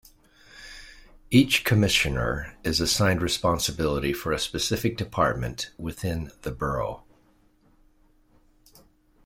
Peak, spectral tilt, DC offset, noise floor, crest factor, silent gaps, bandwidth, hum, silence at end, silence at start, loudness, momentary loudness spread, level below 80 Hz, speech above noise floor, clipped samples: -4 dBFS; -4.5 dB/octave; under 0.1%; -61 dBFS; 22 dB; none; 16.5 kHz; none; 2.25 s; 0.55 s; -25 LUFS; 14 LU; -44 dBFS; 36 dB; under 0.1%